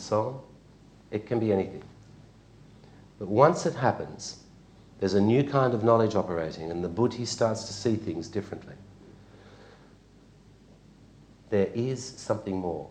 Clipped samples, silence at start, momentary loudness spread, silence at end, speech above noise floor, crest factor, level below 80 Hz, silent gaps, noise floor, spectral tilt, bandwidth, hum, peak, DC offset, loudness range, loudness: under 0.1%; 0 s; 17 LU; 0 s; 28 dB; 26 dB; -60 dBFS; none; -55 dBFS; -6 dB/octave; 9.8 kHz; none; -4 dBFS; under 0.1%; 10 LU; -27 LUFS